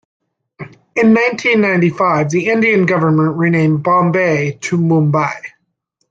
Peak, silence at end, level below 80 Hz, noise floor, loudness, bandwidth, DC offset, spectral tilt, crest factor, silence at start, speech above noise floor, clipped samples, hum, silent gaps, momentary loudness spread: -2 dBFS; 0.65 s; -56 dBFS; -67 dBFS; -13 LUFS; 7.8 kHz; under 0.1%; -7 dB/octave; 12 dB; 0.6 s; 54 dB; under 0.1%; none; none; 9 LU